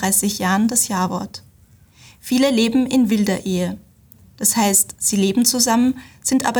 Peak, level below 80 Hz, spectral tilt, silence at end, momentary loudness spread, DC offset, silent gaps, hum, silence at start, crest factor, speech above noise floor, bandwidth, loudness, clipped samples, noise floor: -2 dBFS; -54 dBFS; -3.5 dB/octave; 0 s; 11 LU; under 0.1%; none; none; 0 s; 16 dB; 33 dB; over 20 kHz; -17 LUFS; under 0.1%; -51 dBFS